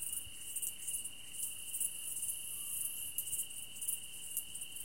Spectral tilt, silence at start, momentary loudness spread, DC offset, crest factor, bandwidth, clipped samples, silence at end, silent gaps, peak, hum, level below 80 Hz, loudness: 1.5 dB/octave; 0 s; 4 LU; 0.3%; 26 dB; 17 kHz; under 0.1%; 0 s; none; -16 dBFS; none; -70 dBFS; -39 LUFS